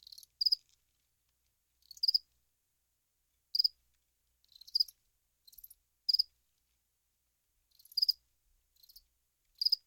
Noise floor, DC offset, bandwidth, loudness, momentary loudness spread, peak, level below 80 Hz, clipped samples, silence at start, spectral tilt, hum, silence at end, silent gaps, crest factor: -81 dBFS; under 0.1%; 19 kHz; -32 LUFS; 7 LU; -18 dBFS; -80 dBFS; under 0.1%; 0.4 s; 3.5 dB/octave; none; 0.1 s; none; 22 dB